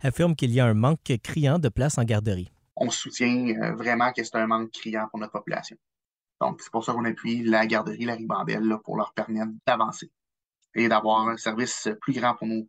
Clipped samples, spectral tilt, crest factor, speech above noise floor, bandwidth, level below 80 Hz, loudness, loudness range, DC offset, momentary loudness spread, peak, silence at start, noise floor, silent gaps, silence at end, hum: under 0.1%; -5.5 dB/octave; 18 dB; over 65 dB; 15 kHz; -52 dBFS; -26 LUFS; 4 LU; under 0.1%; 9 LU; -8 dBFS; 0.05 s; under -90 dBFS; none; 0.05 s; none